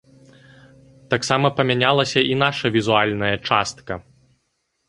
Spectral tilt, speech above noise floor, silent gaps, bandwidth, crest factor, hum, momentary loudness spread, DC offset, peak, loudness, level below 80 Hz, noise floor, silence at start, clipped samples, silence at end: -4.5 dB/octave; 52 dB; none; 11 kHz; 20 dB; none; 10 LU; under 0.1%; -2 dBFS; -19 LUFS; -54 dBFS; -72 dBFS; 1.1 s; under 0.1%; 0.9 s